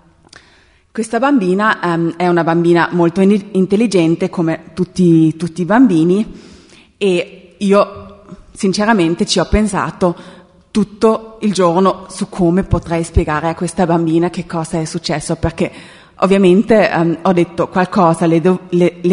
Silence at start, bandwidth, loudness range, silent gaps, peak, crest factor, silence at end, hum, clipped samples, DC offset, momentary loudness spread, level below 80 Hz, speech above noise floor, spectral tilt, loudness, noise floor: 0.95 s; 11 kHz; 3 LU; none; 0 dBFS; 14 dB; 0 s; none; under 0.1%; under 0.1%; 9 LU; -34 dBFS; 36 dB; -6.5 dB/octave; -14 LUFS; -49 dBFS